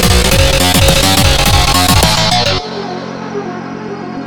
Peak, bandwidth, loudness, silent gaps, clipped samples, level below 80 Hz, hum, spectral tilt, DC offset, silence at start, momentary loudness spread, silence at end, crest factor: 0 dBFS; over 20 kHz; -9 LUFS; none; 0.2%; -20 dBFS; none; -3.5 dB/octave; under 0.1%; 0 s; 15 LU; 0 s; 12 dB